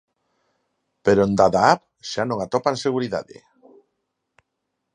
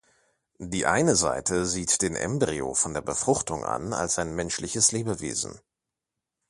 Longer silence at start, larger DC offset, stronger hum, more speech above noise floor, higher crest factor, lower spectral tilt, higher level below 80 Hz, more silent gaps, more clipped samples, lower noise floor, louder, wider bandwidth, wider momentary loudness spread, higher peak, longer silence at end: first, 1.05 s vs 0.6 s; neither; neither; about the same, 58 dB vs 60 dB; about the same, 22 dB vs 22 dB; first, -5.5 dB/octave vs -3 dB/octave; about the same, -54 dBFS vs -50 dBFS; neither; neither; second, -78 dBFS vs -87 dBFS; first, -21 LUFS vs -26 LUFS; second, 10.5 kHz vs 12 kHz; first, 11 LU vs 8 LU; first, 0 dBFS vs -4 dBFS; first, 1.7 s vs 0.9 s